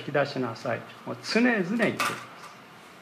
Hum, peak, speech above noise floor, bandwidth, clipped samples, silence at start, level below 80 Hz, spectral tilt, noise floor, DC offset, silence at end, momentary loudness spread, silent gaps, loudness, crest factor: none; -10 dBFS; 21 dB; 15.5 kHz; under 0.1%; 0 s; -76 dBFS; -5 dB/octave; -48 dBFS; under 0.1%; 0 s; 22 LU; none; -27 LUFS; 18 dB